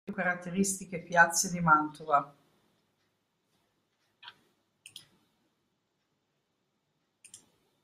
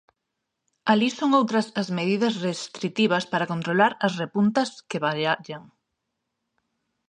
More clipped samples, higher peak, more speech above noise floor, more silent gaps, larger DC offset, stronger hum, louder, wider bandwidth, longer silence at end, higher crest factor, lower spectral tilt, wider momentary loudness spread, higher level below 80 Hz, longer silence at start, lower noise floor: neither; second, -8 dBFS vs -4 dBFS; second, 51 dB vs 58 dB; neither; neither; neither; second, -28 LUFS vs -24 LUFS; first, 15.5 kHz vs 10 kHz; second, 0.45 s vs 1.45 s; first, 26 dB vs 20 dB; second, -3.5 dB/octave vs -5.5 dB/octave; about the same, 8 LU vs 8 LU; about the same, -70 dBFS vs -72 dBFS; second, 0.1 s vs 0.85 s; about the same, -79 dBFS vs -81 dBFS